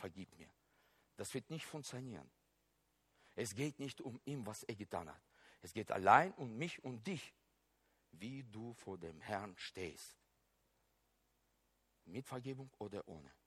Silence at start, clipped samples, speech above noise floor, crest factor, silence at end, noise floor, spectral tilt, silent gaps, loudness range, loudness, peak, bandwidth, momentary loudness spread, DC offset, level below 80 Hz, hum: 0 s; under 0.1%; 38 dB; 32 dB; 0.15 s; -81 dBFS; -5 dB/octave; none; 13 LU; -43 LUFS; -14 dBFS; 16 kHz; 15 LU; under 0.1%; -78 dBFS; none